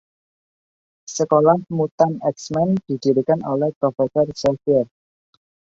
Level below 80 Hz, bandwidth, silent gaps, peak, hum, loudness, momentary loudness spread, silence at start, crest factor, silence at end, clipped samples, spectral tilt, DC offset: -58 dBFS; 8 kHz; 1.92-1.98 s, 3.76-3.81 s; -2 dBFS; none; -20 LUFS; 8 LU; 1.1 s; 18 dB; 0.9 s; under 0.1%; -7 dB/octave; under 0.1%